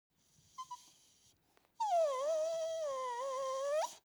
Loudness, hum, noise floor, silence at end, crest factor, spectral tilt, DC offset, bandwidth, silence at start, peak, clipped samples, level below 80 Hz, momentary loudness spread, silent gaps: -37 LUFS; none; -73 dBFS; 0.1 s; 14 dB; 0 dB/octave; under 0.1%; over 20 kHz; 0.6 s; -26 dBFS; under 0.1%; -88 dBFS; 17 LU; none